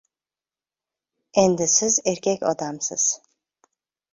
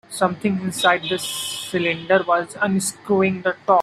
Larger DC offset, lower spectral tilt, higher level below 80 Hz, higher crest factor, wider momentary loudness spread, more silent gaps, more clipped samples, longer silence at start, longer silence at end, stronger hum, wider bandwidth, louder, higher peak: neither; about the same, -3 dB/octave vs -4 dB/octave; about the same, -62 dBFS vs -62 dBFS; about the same, 22 dB vs 18 dB; first, 9 LU vs 6 LU; neither; neither; first, 1.35 s vs 0.1 s; first, 1 s vs 0 s; neither; second, 7.8 kHz vs 15 kHz; about the same, -21 LUFS vs -21 LUFS; about the same, -4 dBFS vs -2 dBFS